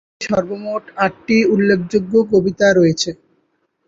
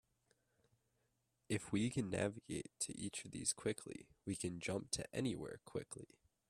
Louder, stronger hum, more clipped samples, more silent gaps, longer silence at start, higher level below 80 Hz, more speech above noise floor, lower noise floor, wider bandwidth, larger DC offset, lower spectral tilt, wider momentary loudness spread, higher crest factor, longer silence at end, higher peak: first, -16 LUFS vs -43 LUFS; neither; neither; neither; second, 0.2 s vs 1.5 s; first, -52 dBFS vs -70 dBFS; first, 49 dB vs 40 dB; second, -65 dBFS vs -84 dBFS; second, 7.8 kHz vs 14.5 kHz; neither; first, -5.5 dB/octave vs -4 dB/octave; about the same, 10 LU vs 10 LU; second, 14 dB vs 22 dB; first, 0.75 s vs 0.45 s; first, -2 dBFS vs -22 dBFS